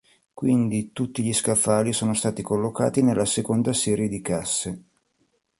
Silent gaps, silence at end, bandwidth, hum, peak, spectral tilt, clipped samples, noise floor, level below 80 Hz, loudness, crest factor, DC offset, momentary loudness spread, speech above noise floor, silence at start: none; 0.8 s; 12 kHz; none; -8 dBFS; -4.5 dB/octave; under 0.1%; -70 dBFS; -54 dBFS; -23 LUFS; 16 dB; under 0.1%; 7 LU; 47 dB; 0.35 s